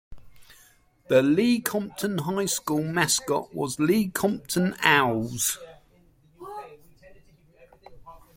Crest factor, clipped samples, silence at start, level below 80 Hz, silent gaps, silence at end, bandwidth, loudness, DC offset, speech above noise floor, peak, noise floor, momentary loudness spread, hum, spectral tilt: 24 dB; under 0.1%; 0.1 s; -58 dBFS; none; 0.2 s; 16.5 kHz; -24 LUFS; under 0.1%; 35 dB; -2 dBFS; -59 dBFS; 15 LU; none; -4 dB/octave